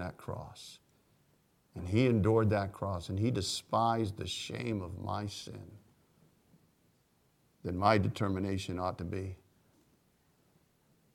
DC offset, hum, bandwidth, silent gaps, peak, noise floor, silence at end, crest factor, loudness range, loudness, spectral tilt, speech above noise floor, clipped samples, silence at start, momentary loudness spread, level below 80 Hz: under 0.1%; none; 15 kHz; none; -12 dBFS; -71 dBFS; 1.8 s; 22 dB; 9 LU; -33 LUFS; -6 dB/octave; 39 dB; under 0.1%; 0 s; 19 LU; -60 dBFS